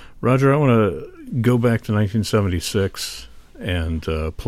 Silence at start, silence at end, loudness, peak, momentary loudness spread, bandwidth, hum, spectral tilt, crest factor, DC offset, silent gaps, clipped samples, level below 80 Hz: 0 s; 0 s; -20 LUFS; -4 dBFS; 13 LU; 15.5 kHz; none; -6.5 dB/octave; 16 dB; under 0.1%; none; under 0.1%; -36 dBFS